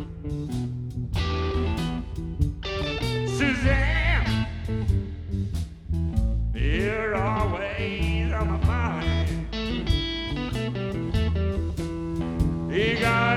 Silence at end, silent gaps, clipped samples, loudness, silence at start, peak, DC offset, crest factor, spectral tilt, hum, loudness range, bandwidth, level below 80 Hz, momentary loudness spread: 0 s; none; under 0.1%; -26 LUFS; 0 s; -6 dBFS; under 0.1%; 18 dB; -6.5 dB/octave; none; 2 LU; 13 kHz; -30 dBFS; 8 LU